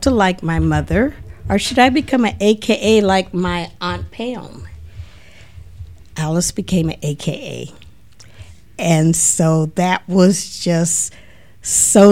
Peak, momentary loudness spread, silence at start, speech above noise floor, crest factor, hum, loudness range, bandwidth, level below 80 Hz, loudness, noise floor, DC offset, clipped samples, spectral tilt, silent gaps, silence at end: 0 dBFS; 18 LU; 0 s; 30 dB; 16 dB; none; 8 LU; 16.5 kHz; -36 dBFS; -16 LUFS; -45 dBFS; 0.8%; under 0.1%; -4.5 dB/octave; none; 0 s